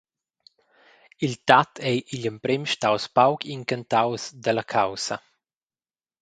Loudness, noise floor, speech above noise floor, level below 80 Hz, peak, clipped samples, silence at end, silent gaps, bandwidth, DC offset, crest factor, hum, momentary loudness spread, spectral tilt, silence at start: -24 LUFS; under -90 dBFS; over 67 dB; -66 dBFS; 0 dBFS; under 0.1%; 1 s; none; 10.5 kHz; under 0.1%; 26 dB; none; 11 LU; -4.5 dB/octave; 1.2 s